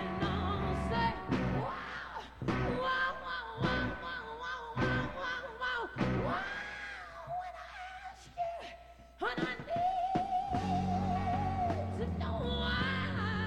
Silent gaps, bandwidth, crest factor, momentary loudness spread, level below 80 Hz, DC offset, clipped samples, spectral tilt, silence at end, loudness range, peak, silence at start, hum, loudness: none; 15.5 kHz; 16 dB; 10 LU; -48 dBFS; under 0.1%; under 0.1%; -6.5 dB/octave; 0 s; 5 LU; -18 dBFS; 0 s; none; -36 LUFS